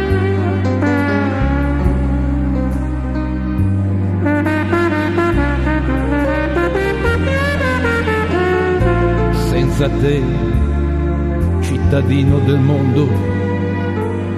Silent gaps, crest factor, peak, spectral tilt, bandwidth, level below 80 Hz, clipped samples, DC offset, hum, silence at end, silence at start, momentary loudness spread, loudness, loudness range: none; 14 dB; 0 dBFS; -8 dB/octave; 13 kHz; -22 dBFS; under 0.1%; under 0.1%; none; 0 s; 0 s; 4 LU; -16 LUFS; 2 LU